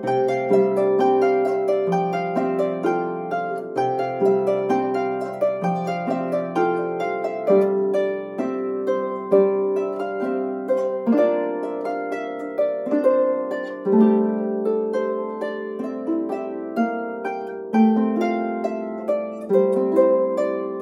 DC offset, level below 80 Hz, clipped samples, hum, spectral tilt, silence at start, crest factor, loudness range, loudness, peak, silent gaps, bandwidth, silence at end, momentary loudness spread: under 0.1%; -74 dBFS; under 0.1%; none; -8 dB/octave; 0 s; 16 dB; 3 LU; -22 LUFS; -4 dBFS; none; 10 kHz; 0 s; 9 LU